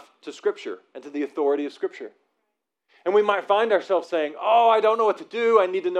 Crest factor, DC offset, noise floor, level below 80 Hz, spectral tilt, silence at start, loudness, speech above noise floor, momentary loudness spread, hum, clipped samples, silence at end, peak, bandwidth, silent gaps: 18 dB; under 0.1%; -79 dBFS; under -90 dBFS; -4.5 dB/octave; 0.25 s; -22 LUFS; 57 dB; 17 LU; none; under 0.1%; 0 s; -4 dBFS; 8.8 kHz; none